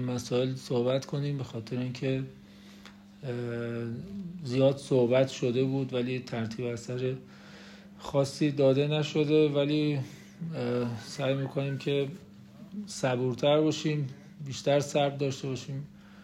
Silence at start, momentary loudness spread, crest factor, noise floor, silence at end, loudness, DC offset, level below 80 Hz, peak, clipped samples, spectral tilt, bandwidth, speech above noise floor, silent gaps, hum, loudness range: 0 s; 18 LU; 18 dB; -51 dBFS; 0 s; -30 LUFS; under 0.1%; -66 dBFS; -12 dBFS; under 0.1%; -6.5 dB/octave; 13.5 kHz; 22 dB; none; none; 5 LU